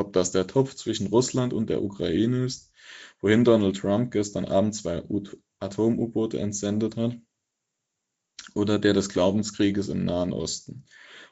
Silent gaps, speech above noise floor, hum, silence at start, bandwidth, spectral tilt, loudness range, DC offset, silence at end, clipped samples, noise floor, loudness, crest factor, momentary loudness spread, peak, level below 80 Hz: none; 57 dB; none; 0 s; 8 kHz; -6 dB/octave; 4 LU; under 0.1%; 0.05 s; under 0.1%; -82 dBFS; -25 LUFS; 20 dB; 13 LU; -6 dBFS; -58 dBFS